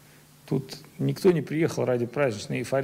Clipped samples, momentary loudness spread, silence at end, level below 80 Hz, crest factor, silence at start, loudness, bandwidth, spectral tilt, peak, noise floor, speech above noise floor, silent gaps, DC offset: under 0.1%; 8 LU; 0 s; -64 dBFS; 16 dB; 0.45 s; -27 LUFS; 16 kHz; -6.5 dB/octave; -10 dBFS; -52 dBFS; 26 dB; none; under 0.1%